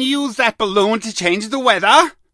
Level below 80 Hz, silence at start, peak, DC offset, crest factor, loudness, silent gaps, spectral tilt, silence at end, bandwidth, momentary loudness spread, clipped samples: -54 dBFS; 0 s; 0 dBFS; under 0.1%; 16 dB; -15 LUFS; none; -3 dB/octave; 0.25 s; 11 kHz; 7 LU; under 0.1%